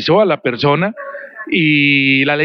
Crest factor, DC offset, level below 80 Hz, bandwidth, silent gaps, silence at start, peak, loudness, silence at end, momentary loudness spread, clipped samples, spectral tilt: 12 dB; under 0.1%; -60 dBFS; 6.2 kHz; none; 0 s; -2 dBFS; -13 LUFS; 0 s; 18 LU; under 0.1%; -7.5 dB/octave